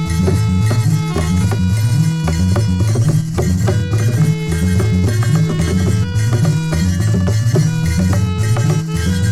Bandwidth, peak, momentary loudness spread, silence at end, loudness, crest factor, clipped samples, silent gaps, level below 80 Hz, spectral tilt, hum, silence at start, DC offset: 13.5 kHz; -2 dBFS; 2 LU; 0 s; -15 LUFS; 12 dB; under 0.1%; none; -30 dBFS; -6.5 dB/octave; none; 0 s; under 0.1%